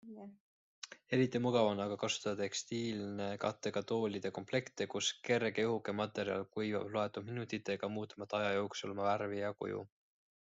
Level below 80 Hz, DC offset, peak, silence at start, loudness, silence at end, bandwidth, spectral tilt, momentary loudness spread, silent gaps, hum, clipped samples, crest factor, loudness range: -78 dBFS; under 0.1%; -18 dBFS; 0.05 s; -38 LUFS; 0.55 s; 8.2 kHz; -4.5 dB/octave; 10 LU; 0.40-0.82 s; none; under 0.1%; 20 dB; 2 LU